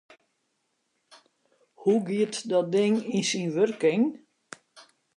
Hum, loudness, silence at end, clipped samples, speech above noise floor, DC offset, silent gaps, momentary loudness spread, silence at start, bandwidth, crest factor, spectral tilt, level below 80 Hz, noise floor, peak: none; -26 LUFS; 0.35 s; under 0.1%; 51 dB; under 0.1%; none; 23 LU; 1.8 s; 11.5 kHz; 16 dB; -5 dB/octave; -80 dBFS; -76 dBFS; -12 dBFS